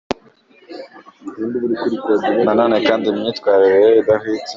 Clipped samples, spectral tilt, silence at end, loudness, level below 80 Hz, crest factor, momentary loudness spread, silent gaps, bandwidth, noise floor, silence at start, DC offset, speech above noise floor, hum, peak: under 0.1%; -6 dB/octave; 0 s; -15 LUFS; -56 dBFS; 14 dB; 23 LU; none; 7.4 kHz; -50 dBFS; 0.1 s; under 0.1%; 35 dB; none; -2 dBFS